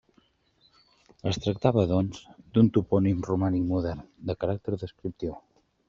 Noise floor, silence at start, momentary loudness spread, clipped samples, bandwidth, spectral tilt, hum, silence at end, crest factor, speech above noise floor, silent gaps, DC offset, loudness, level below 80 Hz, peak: -66 dBFS; 1.25 s; 14 LU; under 0.1%; 7.4 kHz; -8 dB/octave; none; 0.5 s; 22 dB; 40 dB; none; under 0.1%; -27 LUFS; -54 dBFS; -6 dBFS